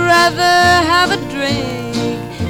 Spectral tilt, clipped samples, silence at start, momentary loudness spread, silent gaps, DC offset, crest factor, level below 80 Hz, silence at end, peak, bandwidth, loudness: -4 dB/octave; under 0.1%; 0 s; 10 LU; none; 0.2%; 14 dB; -38 dBFS; 0 s; 0 dBFS; 19 kHz; -13 LUFS